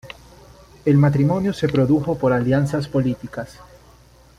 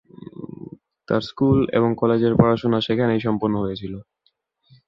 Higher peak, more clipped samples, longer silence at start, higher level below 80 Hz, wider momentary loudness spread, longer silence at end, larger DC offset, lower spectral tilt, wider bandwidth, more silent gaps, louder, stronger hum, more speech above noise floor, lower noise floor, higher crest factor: about the same, -4 dBFS vs -2 dBFS; neither; second, 0.05 s vs 0.2 s; about the same, -48 dBFS vs -48 dBFS; second, 17 LU vs 20 LU; about the same, 0.85 s vs 0.85 s; neither; about the same, -8.5 dB/octave vs -8.5 dB/octave; first, 11 kHz vs 7 kHz; neither; about the same, -19 LUFS vs -20 LUFS; neither; second, 31 dB vs 49 dB; second, -49 dBFS vs -68 dBFS; about the same, 16 dB vs 20 dB